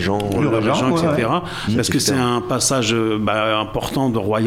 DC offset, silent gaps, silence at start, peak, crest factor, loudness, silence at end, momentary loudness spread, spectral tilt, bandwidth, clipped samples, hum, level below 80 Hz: under 0.1%; none; 0 s; -4 dBFS; 14 dB; -18 LUFS; 0 s; 4 LU; -4.5 dB/octave; 16.5 kHz; under 0.1%; none; -42 dBFS